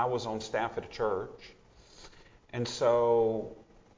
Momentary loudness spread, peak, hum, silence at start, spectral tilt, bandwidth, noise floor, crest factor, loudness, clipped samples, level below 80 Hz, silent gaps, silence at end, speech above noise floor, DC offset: 17 LU; -14 dBFS; none; 0 s; -5 dB/octave; 7.6 kHz; -55 dBFS; 18 dB; -31 LUFS; under 0.1%; -60 dBFS; none; 0.35 s; 24 dB; under 0.1%